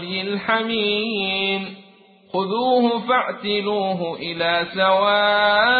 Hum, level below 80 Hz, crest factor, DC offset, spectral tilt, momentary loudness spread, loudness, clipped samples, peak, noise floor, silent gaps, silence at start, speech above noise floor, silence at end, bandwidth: none; -60 dBFS; 16 dB; under 0.1%; -9.5 dB/octave; 9 LU; -20 LUFS; under 0.1%; -4 dBFS; -50 dBFS; none; 0 s; 30 dB; 0 s; 4.8 kHz